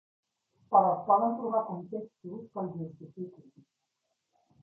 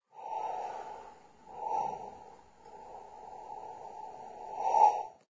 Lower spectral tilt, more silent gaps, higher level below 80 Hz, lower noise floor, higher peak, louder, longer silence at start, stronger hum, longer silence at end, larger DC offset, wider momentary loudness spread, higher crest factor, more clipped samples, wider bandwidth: first, -12 dB/octave vs -3.5 dB/octave; neither; second, -80 dBFS vs -74 dBFS; first, -82 dBFS vs -55 dBFS; about the same, -10 dBFS vs -12 dBFS; first, -29 LUFS vs -33 LUFS; first, 0.7 s vs 0.15 s; neither; first, 1.2 s vs 0.15 s; neither; second, 19 LU vs 25 LU; about the same, 22 dB vs 24 dB; neither; second, 2.2 kHz vs 7.8 kHz